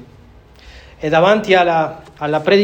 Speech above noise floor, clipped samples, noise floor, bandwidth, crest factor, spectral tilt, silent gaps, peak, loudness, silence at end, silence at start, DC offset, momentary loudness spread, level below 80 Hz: 29 dB; under 0.1%; -43 dBFS; 15 kHz; 16 dB; -6 dB/octave; none; 0 dBFS; -15 LUFS; 0 s; 0.65 s; under 0.1%; 12 LU; -46 dBFS